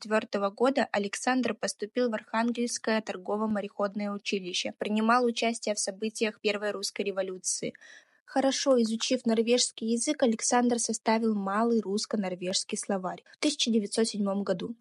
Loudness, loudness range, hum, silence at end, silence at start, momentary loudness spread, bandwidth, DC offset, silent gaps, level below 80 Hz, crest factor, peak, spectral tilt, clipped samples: -29 LUFS; 4 LU; none; 0.05 s; 0 s; 7 LU; 12 kHz; under 0.1%; 8.20-8.26 s; -84 dBFS; 18 dB; -10 dBFS; -3 dB/octave; under 0.1%